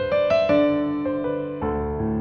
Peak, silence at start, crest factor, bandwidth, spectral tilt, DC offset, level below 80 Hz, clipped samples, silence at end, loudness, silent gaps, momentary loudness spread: -8 dBFS; 0 s; 14 dB; 6.6 kHz; -8 dB/octave; under 0.1%; -40 dBFS; under 0.1%; 0 s; -22 LUFS; none; 8 LU